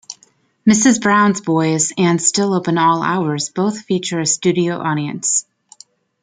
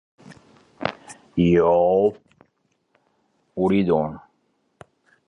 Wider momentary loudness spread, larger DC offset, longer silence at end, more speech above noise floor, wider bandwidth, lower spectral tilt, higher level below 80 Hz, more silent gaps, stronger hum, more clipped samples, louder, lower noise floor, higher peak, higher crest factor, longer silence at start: second, 8 LU vs 17 LU; neither; second, 0.8 s vs 1.1 s; second, 40 dB vs 51 dB; second, 9.6 kHz vs 11 kHz; second, -4 dB/octave vs -8 dB/octave; second, -60 dBFS vs -50 dBFS; neither; neither; neither; first, -16 LUFS vs -21 LUFS; second, -55 dBFS vs -69 dBFS; about the same, -2 dBFS vs -2 dBFS; about the same, 16 dB vs 20 dB; second, 0.1 s vs 0.8 s